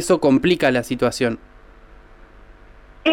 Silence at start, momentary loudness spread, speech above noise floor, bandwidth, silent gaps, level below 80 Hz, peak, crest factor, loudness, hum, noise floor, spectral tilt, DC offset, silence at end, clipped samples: 0 s; 8 LU; 27 dB; 16.5 kHz; none; -46 dBFS; -6 dBFS; 16 dB; -19 LUFS; none; -45 dBFS; -5 dB/octave; under 0.1%; 0 s; under 0.1%